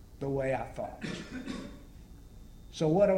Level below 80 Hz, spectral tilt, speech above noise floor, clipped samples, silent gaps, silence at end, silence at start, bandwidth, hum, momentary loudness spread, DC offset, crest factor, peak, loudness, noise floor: -52 dBFS; -7 dB/octave; 20 dB; under 0.1%; none; 0 s; 0 s; 16 kHz; none; 23 LU; under 0.1%; 20 dB; -14 dBFS; -34 LUFS; -50 dBFS